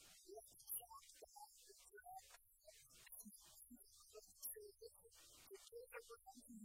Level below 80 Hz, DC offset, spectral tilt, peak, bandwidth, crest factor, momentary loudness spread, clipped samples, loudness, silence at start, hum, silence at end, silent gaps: -82 dBFS; under 0.1%; -1.5 dB/octave; -38 dBFS; 16 kHz; 24 dB; 14 LU; under 0.1%; -58 LUFS; 0 s; none; 0 s; none